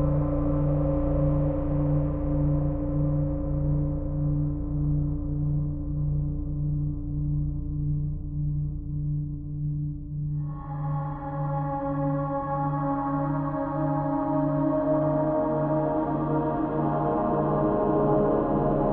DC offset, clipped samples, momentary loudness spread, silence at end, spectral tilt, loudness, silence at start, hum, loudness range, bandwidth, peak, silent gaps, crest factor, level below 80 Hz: under 0.1%; under 0.1%; 7 LU; 0 s; -14 dB/octave; -27 LUFS; 0 s; none; 5 LU; 2.7 kHz; -12 dBFS; none; 14 dB; -34 dBFS